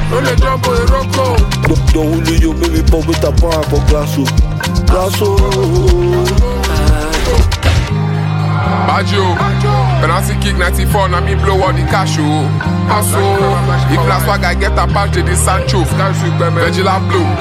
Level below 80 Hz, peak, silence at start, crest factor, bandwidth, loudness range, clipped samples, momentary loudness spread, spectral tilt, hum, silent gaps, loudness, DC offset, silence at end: -16 dBFS; 0 dBFS; 0 s; 10 dB; 16.5 kHz; 1 LU; under 0.1%; 2 LU; -5.5 dB/octave; none; none; -12 LUFS; under 0.1%; 0 s